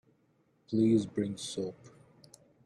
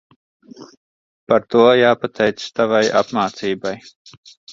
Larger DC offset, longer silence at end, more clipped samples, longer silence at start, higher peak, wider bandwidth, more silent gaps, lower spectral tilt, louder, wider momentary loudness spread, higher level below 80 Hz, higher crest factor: neither; first, 0.8 s vs 0 s; neither; about the same, 0.7 s vs 0.6 s; second, -16 dBFS vs -2 dBFS; first, 12 kHz vs 7.6 kHz; second, none vs 0.77-1.27 s, 3.96-4.05 s, 4.17-4.23 s, 4.37-4.47 s; first, -6.5 dB/octave vs -5 dB/octave; second, -32 LUFS vs -17 LUFS; about the same, 11 LU vs 11 LU; second, -72 dBFS vs -60 dBFS; about the same, 18 dB vs 18 dB